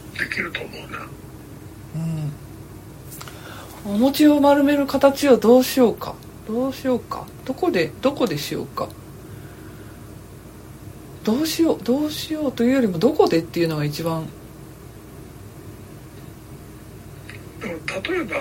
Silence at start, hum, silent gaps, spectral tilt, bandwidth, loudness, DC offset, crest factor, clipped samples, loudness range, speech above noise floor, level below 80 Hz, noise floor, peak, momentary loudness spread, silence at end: 0 s; none; none; -5.5 dB/octave; 16.5 kHz; -20 LUFS; under 0.1%; 20 dB; under 0.1%; 16 LU; 20 dB; -48 dBFS; -40 dBFS; -2 dBFS; 25 LU; 0 s